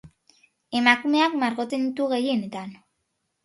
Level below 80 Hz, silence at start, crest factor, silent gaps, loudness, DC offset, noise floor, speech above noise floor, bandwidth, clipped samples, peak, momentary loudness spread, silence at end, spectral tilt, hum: -70 dBFS; 0.05 s; 24 dB; none; -23 LUFS; under 0.1%; -76 dBFS; 53 dB; 11.5 kHz; under 0.1%; -2 dBFS; 15 LU; 0.7 s; -4.5 dB/octave; none